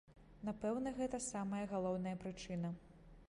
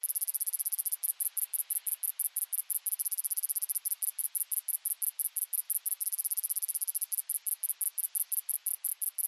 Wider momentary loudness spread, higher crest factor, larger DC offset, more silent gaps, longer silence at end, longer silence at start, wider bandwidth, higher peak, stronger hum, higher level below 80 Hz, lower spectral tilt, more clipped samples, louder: first, 7 LU vs 2 LU; second, 14 dB vs 22 dB; neither; neither; about the same, 0.05 s vs 0 s; about the same, 0.1 s vs 0.05 s; second, 11 kHz vs 13.5 kHz; second, -28 dBFS vs -12 dBFS; neither; first, -64 dBFS vs under -90 dBFS; first, -6 dB/octave vs 8.5 dB/octave; neither; second, -43 LUFS vs -31 LUFS